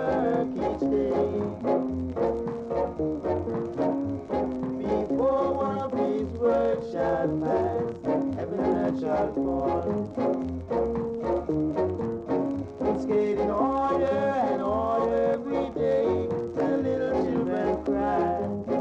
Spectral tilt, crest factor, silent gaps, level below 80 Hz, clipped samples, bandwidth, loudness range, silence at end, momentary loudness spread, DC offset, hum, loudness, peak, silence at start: -8.5 dB/octave; 14 dB; none; -48 dBFS; under 0.1%; 8 kHz; 3 LU; 0 s; 5 LU; under 0.1%; none; -27 LUFS; -12 dBFS; 0 s